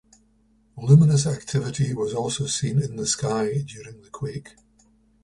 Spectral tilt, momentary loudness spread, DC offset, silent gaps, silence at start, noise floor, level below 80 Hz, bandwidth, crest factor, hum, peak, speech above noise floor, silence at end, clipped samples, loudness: -5.5 dB/octave; 18 LU; under 0.1%; none; 0.75 s; -61 dBFS; -54 dBFS; 11.5 kHz; 20 dB; none; -4 dBFS; 39 dB; 0.75 s; under 0.1%; -23 LUFS